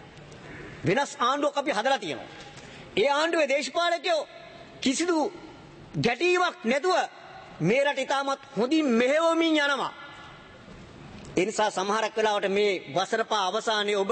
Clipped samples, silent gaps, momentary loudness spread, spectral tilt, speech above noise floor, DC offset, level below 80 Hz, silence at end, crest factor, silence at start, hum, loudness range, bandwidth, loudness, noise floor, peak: under 0.1%; none; 21 LU; -4 dB/octave; 21 dB; under 0.1%; -62 dBFS; 0 s; 16 dB; 0 s; none; 2 LU; 8.8 kHz; -26 LUFS; -47 dBFS; -10 dBFS